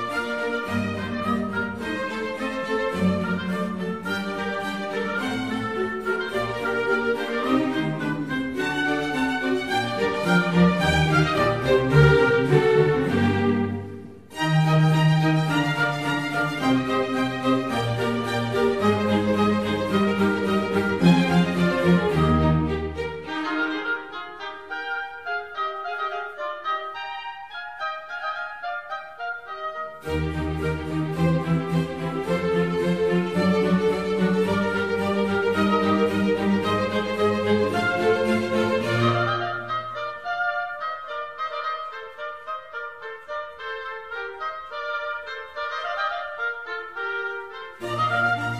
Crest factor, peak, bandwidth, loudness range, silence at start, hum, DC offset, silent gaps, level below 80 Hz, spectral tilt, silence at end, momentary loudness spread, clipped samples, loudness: 20 dB; -4 dBFS; 14 kHz; 10 LU; 0 s; none; 0.2%; none; -44 dBFS; -6.5 dB/octave; 0 s; 13 LU; under 0.1%; -24 LUFS